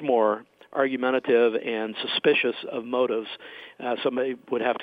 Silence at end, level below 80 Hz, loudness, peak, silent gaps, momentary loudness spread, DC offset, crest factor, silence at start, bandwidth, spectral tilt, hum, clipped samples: 0 s; -76 dBFS; -25 LUFS; -8 dBFS; none; 12 LU; under 0.1%; 18 dB; 0 s; 5 kHz; -6.5 dB/octave; none; under 0.1%